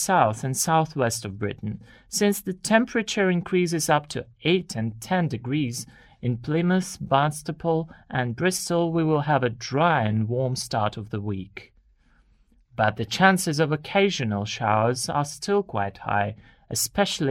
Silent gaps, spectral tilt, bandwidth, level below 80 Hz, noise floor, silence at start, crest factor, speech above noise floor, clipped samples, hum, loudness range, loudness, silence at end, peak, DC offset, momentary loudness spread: none; -4.5 dB/octave; 16 kHz; -56 dBFS; -60 dBFS; 0 s; 20 dB; 36 dB; under 0.1%; none; 3 LU; -24 LUFS; 0 s; -4 dBFS; under 0.1%; 9 LU